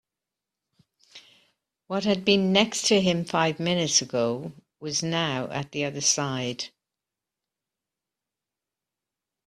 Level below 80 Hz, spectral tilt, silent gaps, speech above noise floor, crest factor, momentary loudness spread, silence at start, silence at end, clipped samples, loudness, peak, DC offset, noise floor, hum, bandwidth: -66 dBFS; -3.5 dB/octave; none; 63 dB; 24 dB; 11 LU; 1.15 s; 2.8 s; under 0.1%; -24 LUFS; -4 dBFS; under 0.1%; -88 dBFS; none; 13.5 kHz